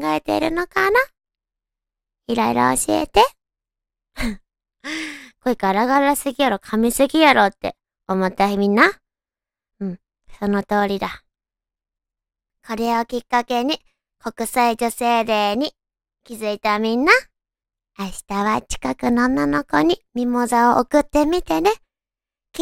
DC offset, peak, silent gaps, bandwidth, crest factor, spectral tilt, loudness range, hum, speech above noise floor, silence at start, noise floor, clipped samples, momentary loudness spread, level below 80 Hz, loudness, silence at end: under 0.1%; 0 dBFS; none; 16.5 kHz; 20 dB; -4 dB/octave; 7 LU; none; over 71 dB; 0 s; under -90 dBFS; under 0.1%; 15 LU; -44 dBFS; -19 LUFS; 0 s